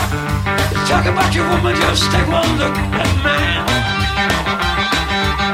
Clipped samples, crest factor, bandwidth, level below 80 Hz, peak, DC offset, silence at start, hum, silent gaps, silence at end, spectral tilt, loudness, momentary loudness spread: under 0.1%; 14 dB; 16 kHz; -26 dBFS; -2 dBFS; under 0.1%; 0 s; none; none; 0 s; -4.5 dB/octave; -15 LUFS; 3 LU